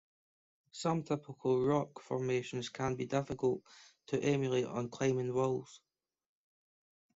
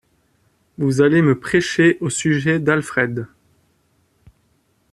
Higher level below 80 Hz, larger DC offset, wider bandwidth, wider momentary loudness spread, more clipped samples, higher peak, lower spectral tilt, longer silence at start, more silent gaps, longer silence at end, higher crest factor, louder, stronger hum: second, -70 dBFS vs -54 dBFS; neither; second, 8 kHz vs 12.5 kHz; about the same, 8 LU vs 9 LU; neither; second, -18 dBFS vs -2 dBFS; about the same, -6 dB/octave vs -5.5 dB/octave; about the same, 0.75 s vs 0.8 s; neither; second, 1.4 s vs 1.65 s; about the same, 18 dB vs 16 dB; second, -35 LUFS vs -17 LUFS; neither